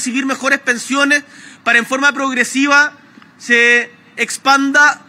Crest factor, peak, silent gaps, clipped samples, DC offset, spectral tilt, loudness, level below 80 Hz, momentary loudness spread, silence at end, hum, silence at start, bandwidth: 14 dB; 0 dBFS; none; under 0.1%; under 0.1%; -1 dB/octave; -13 LUFS; -76 dBFS; 9 LU; 0.1 s; none; 0 s; 16 kHz